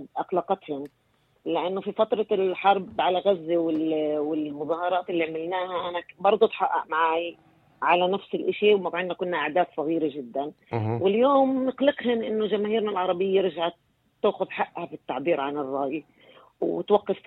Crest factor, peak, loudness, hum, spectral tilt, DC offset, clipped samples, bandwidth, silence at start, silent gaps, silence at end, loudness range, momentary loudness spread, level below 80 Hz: 18 dB; -6 dBFS; -26 LUFS; none; -8.5 dB/octave; under 0.1%; under 0.1%; 4.4 kHz; 0 s; none; 0.1 s; 3 LU; 9 LU; -72 dBFS